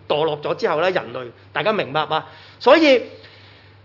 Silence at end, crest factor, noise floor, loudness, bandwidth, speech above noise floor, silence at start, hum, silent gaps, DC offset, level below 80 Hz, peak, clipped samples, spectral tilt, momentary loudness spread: 0.7 s; 20 dB; -46 dBFS; -19 LUFS; 6 kHz; 27 dB; 0.1 s; none; none; under 0.1%; -66 dBFS; 0 dBFS; under 0.1%; -5.5 dB/octave; 15 LU